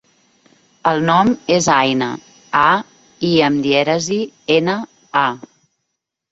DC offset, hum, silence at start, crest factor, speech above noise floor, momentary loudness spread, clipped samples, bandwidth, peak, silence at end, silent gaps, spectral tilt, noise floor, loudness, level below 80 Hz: under 0.1%; none; 0.85 s; 16 dB; 61 dB; 8 LU; under 0.1%; 8.2 kHz; 0 dBFS; 0.95 s; none; -4.5 dB/octave; -76 dBFS; -16 LUFS; -56 dBFS